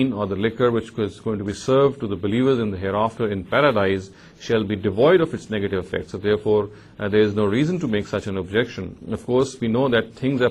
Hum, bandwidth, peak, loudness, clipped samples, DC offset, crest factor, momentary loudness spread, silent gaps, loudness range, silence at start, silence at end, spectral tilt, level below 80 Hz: none; 10.5 kHz; -6 dBFS; -22 LUFS; under 0.1%; under 0.1%; 16 dB; 9 LU; none; 2 LU; 0 s; 0 s; -6.5 dB/octave; -46 dBFS